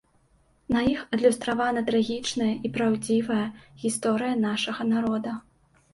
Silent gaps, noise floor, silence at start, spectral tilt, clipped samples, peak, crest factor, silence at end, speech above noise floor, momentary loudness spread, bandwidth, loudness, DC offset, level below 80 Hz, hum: none; -63 dBFS; 0.7 s; -4.5 dB/octave; under 0.1%; -8 dBFS; 18 dB; 0.55 s; 38 dB; 7 LU; 11.5 kHz; -26 LUFS; under 0.1%; -56 dBFS; none